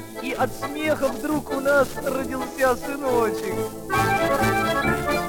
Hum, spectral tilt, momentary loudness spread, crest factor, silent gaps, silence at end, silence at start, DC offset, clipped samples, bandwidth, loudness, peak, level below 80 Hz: none; -5 dB/octave; 7 LU; 14 dB; none; 0 s; 0 s; under 0.1%; under 0.1%; 19 kHz; -23 LUFS; -8 dBFS; -44 dBFS